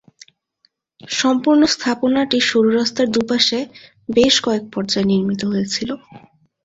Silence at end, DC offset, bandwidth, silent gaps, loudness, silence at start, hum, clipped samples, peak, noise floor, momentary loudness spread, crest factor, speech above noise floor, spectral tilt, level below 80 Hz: 0.45 s; under 0.1%; 8 kHz; none; -17 LUFS; 1.05 s; none; under 0.1%; -2 dBFS; -63 dBFS; 10 LU; 18 dB; 46 dB; -4 dB/octave; -54 dBFS